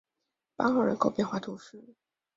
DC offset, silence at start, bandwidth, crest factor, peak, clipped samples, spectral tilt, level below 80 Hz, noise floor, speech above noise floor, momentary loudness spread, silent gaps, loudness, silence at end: under 0.1%; 0.6 s; 7.8 kHz; 22 dB; -10 dBFS; under 0.1%; -6.5 dB/octave; -70 dBFS; -85 dBFS; 56 dB; 15 LU; none; -29 LUFS; 0.55 s